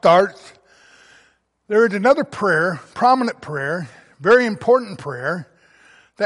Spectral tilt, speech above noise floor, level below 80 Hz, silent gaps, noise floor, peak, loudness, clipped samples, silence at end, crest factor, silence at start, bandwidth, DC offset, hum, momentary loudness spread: -6 dB/octave; 42 dB; -62 dBFS; none; -59 dBFS; -2 dBFS; -18 LUFS; under 0.1%; 0 s; 16 dB; 0.05 s; 11.5 kHz; under 0.1%; none; 11 LU